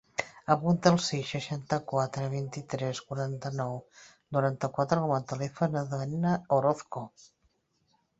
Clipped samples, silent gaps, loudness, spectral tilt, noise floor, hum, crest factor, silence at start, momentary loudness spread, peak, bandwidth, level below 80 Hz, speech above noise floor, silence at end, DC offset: under 0.1%; none; -30 LUFS; -6 dB/octave; -73 dBFS; none; 24 dB; 0.2 s; 10 LU; -6 dBFS; 8 kHz; -66 dBFS; 43 dB; 1.1 s; under 0.1%